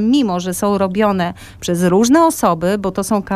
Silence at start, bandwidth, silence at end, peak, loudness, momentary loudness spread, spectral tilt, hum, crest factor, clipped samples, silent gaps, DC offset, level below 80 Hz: 0 s; 16 kHz; 0 s; -2 dBFS; -15 LUFS; 8 LU; -5.5 dB/octave; none; 14 dB; under 0.1%; none; under 0.1%; -44 dBFS